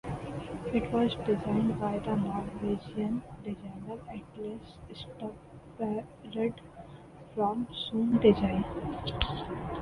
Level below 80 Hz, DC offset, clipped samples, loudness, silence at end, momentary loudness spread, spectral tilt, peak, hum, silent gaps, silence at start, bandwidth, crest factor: -50 dBFS; under 0.1%; under 0.1%; -32 LUFS; 0 s; 17 LU; -8 dB/octave; -10 dBFS; none; none; 0.05 s; 11 kHz; 22 dB